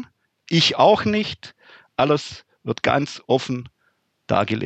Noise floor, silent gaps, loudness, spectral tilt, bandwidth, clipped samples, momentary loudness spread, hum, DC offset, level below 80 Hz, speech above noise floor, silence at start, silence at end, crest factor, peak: -67 dBFS; none; -20 LUFS; -5 dB/octave; 8.8 kHz; under 0.1%; 17 LU; none; under 0.1%; -58 dBFS; 47 dB; 0 s; 0 s; 18 dB; -4 dBFS